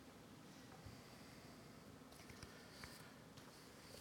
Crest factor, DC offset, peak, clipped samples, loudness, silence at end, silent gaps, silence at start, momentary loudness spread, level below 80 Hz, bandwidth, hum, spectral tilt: 22 dB; under 0.1%; -38 dBFS; under 0.1%; -59 LUFS; 0 s; none; 0 s; 4 LU; -74 dBFS; 17.5 kHz; none; -4 dB/octave